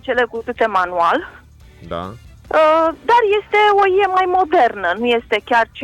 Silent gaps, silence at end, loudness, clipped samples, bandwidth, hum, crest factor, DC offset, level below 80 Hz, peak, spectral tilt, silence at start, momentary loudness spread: none; 0 s; -15 LUFS; under 0.1%; 12 kHz; none; 10 dB; under 0.1%; -48 dBFS; -6 dBFS; -5 dB/octave; 0.05 s; 15 LU